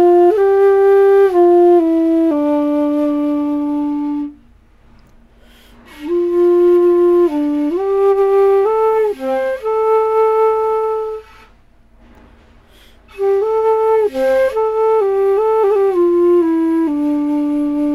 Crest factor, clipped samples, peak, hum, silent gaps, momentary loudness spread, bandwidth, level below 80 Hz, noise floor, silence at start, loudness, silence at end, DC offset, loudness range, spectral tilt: 10 dB; under 0.1%; -4 dBFS; none; none; 8 LU; 12 kHz; -48 dBFS; -47 dBFS; 0 s; -14 LUFS; 0 s; under 0.1%; 8 LU; -6.5 dB/octave